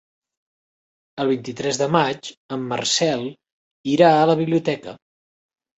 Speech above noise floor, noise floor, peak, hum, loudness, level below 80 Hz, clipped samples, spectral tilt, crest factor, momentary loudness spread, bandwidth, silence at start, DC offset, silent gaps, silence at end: over 70 dB; under -90 dBFS; -2 dBFS; none; -20 LUFS; -64 dBFS; under 0.1%; -4.5 dB/octave; 20 dB; 17 LU; 8.2 kHz; 1.15 s; under 0.1%; 2.37-2.49 s, 3.52-3.84 s; 0.85 s